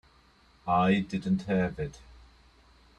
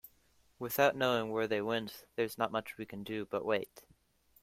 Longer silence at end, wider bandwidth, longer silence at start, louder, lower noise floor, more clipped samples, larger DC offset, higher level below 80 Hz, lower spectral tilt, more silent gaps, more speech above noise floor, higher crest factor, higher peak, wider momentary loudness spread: first, 0.85 s vs 0.6 s; second, 8.6 kHz vs 16.5 kHz; first, 0.65 s vs 0.05 s; first, -29 LUFS vs -35 LUFS; second, -61 dBFS vs -70 dBFS; neither; neither; first, -54 dBFS vs -72 dBFS; first, -7.5 dB/octave vs -4.5 dB/octave; neither; about the same, 33 dB vs 35 dB; about the same, 18 dB vs 22 dB; about the same, -14 dBFS vs -14 dBFS; about the same, 14 LU vs 14 LU